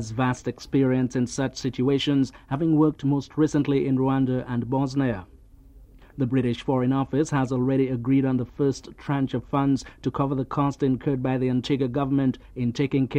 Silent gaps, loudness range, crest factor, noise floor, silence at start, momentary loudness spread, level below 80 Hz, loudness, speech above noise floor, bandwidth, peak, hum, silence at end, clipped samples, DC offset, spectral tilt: none; 2 LU; 16 dB; -49 dBFS; 0 s; 5 LU; -50 dBFS; -25 LUFS; 25 dB; 9.6 kHz; -8 dBFS; none; 0 s; under 0.1%; under 0.1%; -7 dB/octave